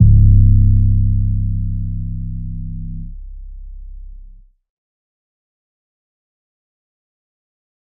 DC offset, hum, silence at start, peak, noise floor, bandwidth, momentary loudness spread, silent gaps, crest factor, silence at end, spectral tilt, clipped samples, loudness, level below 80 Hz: under 0.1%; none; 0 s; 0 dBFS; -41 dBFS; 0.6 kHz; 27 LU; none; 16 dB; 3.75 s; -24.5 dB/octave; under 0.1%; -16 LUFS; -20 dBFS